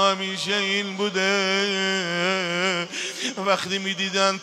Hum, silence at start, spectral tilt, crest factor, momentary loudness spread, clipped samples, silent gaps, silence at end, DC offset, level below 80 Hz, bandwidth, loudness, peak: none; 0 s; -3 dB/octave; 20 dB; 5 LU; under 0.1%; none; 0 s; under 0.1%; -76 dBFS; 14 kHz; -23 LUFS; -4 dBFS